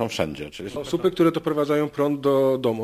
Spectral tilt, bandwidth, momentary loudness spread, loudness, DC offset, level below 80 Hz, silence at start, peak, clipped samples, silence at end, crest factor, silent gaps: -6.5 dB/octave; 15.5 kHz; 11 LU; -23 LUFS; under 0.1%; -54 dBFS; 0 s; -8 dBFS; under 0.1%; 0 s; 16 dB; none